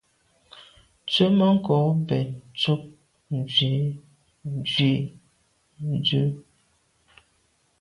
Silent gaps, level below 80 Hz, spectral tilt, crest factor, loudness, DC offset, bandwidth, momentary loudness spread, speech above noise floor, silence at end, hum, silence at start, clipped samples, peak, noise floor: none; -60 dBFS; -7 dB/octave; 18 dB; -24 LUFS; under 0.1%; 11 kHz; 15 LU; 44 dB; 1.4 s; none; 0.55 s; under 0.1%; -8 dBFS; -67 dBFS